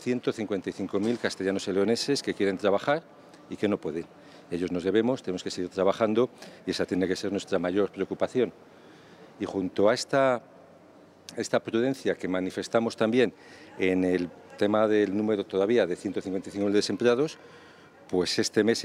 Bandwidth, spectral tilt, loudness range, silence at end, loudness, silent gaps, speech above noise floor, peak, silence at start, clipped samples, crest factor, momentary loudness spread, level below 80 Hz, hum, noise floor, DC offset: 14 kHz; -5 dB/octave; 3 LU; 0 s; -28 LUFS; none; 27 dB; -10 dBFS; 0 s; under 0.1%; 18 dB; 9 LU; -72 dBFS; none; -54 dBFS; under 0.1%